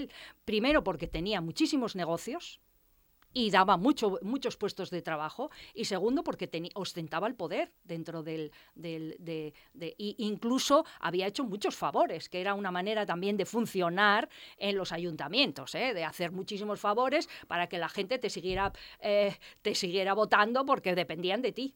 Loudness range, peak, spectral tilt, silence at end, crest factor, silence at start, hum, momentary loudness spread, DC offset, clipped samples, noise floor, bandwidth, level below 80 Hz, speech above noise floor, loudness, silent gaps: 5 LU; -10 dBFS; -4.5 dB/octave; 0.05 s; 22 dB; 0 s; none; 14 LU; under 0.1%; under 0.1%; -68 dBFS; 19.5 kHz; -58 dBFS; 36 dB; -32 LUFS; none